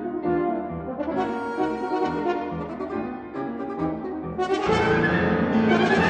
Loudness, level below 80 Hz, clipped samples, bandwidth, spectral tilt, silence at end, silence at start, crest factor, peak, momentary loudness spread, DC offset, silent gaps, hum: -25 LUFS; -48 dBFS; under 0.1%; 9.4 kHz; -7 dB/octave; 0 s; 0 s; 16 dB; -8 dBFS; 11 LU; under 0.1%; none; none